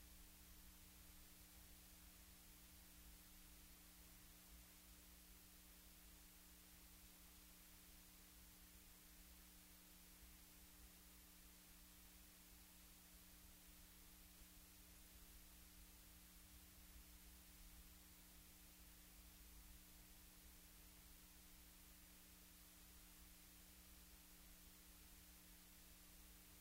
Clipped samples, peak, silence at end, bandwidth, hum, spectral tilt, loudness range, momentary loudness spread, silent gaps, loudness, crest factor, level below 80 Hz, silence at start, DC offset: under 0.1%; -50 dBFS; 0 s; 16 kHz; none; -2.5 dB/octave; 0 LU; 1 LU; none; -64 LUFS; 14 dB; -70 dBFS; 0 s; under 0.1%